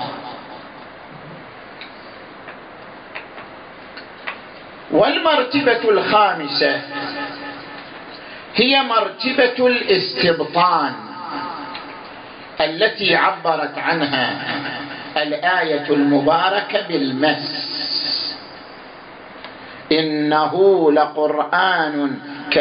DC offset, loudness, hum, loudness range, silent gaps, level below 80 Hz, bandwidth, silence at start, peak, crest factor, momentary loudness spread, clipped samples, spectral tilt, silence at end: under 0.1%; -18 LUFS; none; 14 LU; none; -60 dBFS; 5.4 kHz; 0 s; -4 dBFS; 16 dB; 22 LU; under 0.1%; -9.5 dB/octave; 0 s